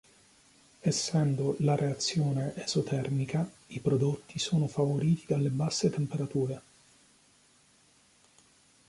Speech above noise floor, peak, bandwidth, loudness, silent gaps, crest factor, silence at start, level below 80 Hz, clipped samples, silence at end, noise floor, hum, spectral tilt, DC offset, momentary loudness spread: 34 dB; -14 dBFS; 11.5 kHz; -30 LUFS; none; 16 dB; 0.85 s; -66 dBFS; under 0.1%; 2.3 s; -64 dBFS; none; -6 dB/octave; under 0.1%; 6 LU